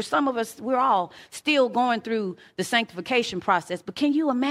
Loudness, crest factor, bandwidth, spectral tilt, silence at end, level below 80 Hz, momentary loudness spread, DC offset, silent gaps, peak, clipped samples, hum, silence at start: -24 LUFS; 18 dB; 15.5 kHz; -4 dB/octave; 0 s; -68 dBFS; 8 LU; under 0.1%; none; -6 dBFS; under 0.1%; none; 0 s